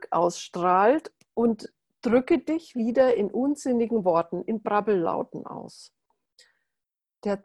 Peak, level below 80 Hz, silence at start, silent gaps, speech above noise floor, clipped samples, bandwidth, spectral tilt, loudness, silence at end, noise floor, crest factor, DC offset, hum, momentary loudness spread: -8 dBFS; -64 dBFS; 0 s; none; 62 dB; under 0.1%; 12 kHz; -6 dB/octave; -25 LUFS; 0.05 s; -86 dBFS; 18 dB; under 0.1%; none; 14 LU